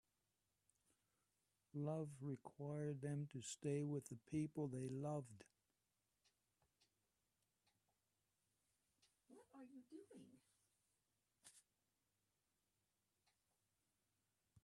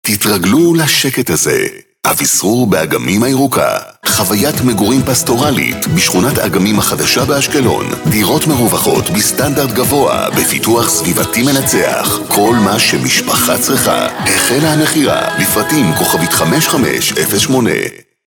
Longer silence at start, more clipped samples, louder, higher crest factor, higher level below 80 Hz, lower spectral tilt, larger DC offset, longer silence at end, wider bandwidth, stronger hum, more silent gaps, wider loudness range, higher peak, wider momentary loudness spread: first, 1.75 s vs 0.05 s; neither; second, -49 LUFS vs -11 LUFS; first, 20 dB vs 12 dB; second, -88 dBFS vs -40 dBFS; first, -7 dB/octave vs -3.5 dB/octave; neither; first, 3.05 s vs 0.3 s; second, 12 kHz vs 19 kHz; neither; neither; first, 20 LU vs 1 LU; second, -34 dBFS vs 0 dBFS; first, 21 LU vs 3 LU